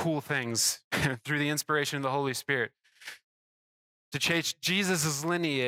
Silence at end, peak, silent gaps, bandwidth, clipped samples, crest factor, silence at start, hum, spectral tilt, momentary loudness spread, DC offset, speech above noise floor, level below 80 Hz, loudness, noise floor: 0 s; -12 dBFS; 0.84-0.91 s, 3.24-4.11 s; 17.5 kHz; under 0.1%; 18 dB; 0 s; none; -3 dB/octave; 11 LU; under 0.1%; over 60 dB; -64 dBFS; -29 LUFS; under -90 dBFS